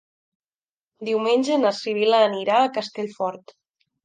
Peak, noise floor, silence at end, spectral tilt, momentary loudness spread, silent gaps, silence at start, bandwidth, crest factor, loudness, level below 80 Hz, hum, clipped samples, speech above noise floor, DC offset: -6 dBFS; under -90 dBFS; 0.65 s; -4.5 dB/octave; 11 LU; none; 1 s; 9.6 kHz; 18 dB; -21 LUFS; -78 dBFS; none; under 0.1%; over 69 dB; under 0.1%